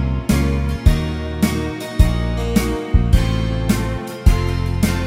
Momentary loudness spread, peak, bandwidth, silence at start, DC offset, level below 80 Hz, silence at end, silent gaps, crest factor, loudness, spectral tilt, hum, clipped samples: 4 LU; 0 dBFS; 16.5 kHz; 0 s; under 0.1%; -20 dBFS; 0 s; none; 16 dB; -19 LUFS; -6.5 dB/octave; none; under 0.1%